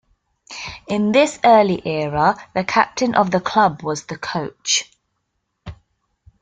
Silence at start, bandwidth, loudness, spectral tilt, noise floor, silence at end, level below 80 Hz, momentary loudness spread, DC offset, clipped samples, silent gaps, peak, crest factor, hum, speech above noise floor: 0.5 s; 9.6 kHz; -18 LUFS; -4 dB/octave; -73 dBFS; 0.7 s; -52 dBFS; 13 LU; under 0.1%; under 0.1%; none; 0 dBFS; 18 dB; none; 55 dB